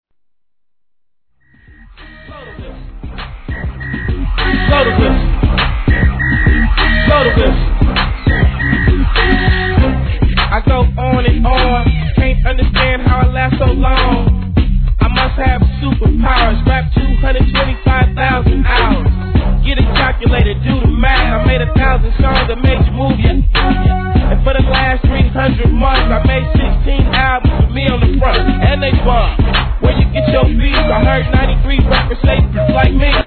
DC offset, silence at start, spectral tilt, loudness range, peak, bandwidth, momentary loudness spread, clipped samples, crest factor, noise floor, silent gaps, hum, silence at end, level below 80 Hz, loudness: 0.2%; 2 s; -9.5 dB/octave; 2 LU; 0 dBFS; 4.5 kHz; 3 LU; under 0.1%; 12 dB; -76 dBFS; none; none; 0 s; -14 dBFS; -13 LUFS